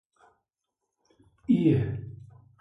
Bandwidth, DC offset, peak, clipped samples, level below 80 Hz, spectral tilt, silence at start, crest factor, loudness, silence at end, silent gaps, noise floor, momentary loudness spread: 5.6 kHz; under 0.1%; -10 dBFS; under 0.1%; -56 dBFS; -10.5 dB/octave; 1.5 s; 20 dB; -26 LUFS; 0.4 s; none; -85 dBFS; 22 LU